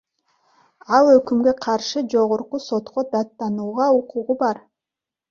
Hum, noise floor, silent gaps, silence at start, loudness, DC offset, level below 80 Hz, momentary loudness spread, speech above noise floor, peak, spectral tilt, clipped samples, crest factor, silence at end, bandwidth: none; -88 dBFS; none; 0.9 s; -20 LUFS; under 0.1%; -62 dBFS; 11 LU; 68 dB; -2 dBFS; -5 dB/octave; under 0.1%; 18 dB; 0.7 s; 7.2 kHz